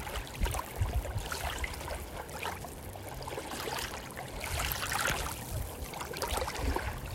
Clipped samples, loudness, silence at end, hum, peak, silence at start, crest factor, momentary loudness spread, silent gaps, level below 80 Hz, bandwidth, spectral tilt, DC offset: under 0.1%; -36 LUFS; 0 s; none; -14 dBFS; 0 s; 22 dB; 9 LU; none; -42 dBFS; 16.5 kHz; -3.5 dB/octave; under 0.1%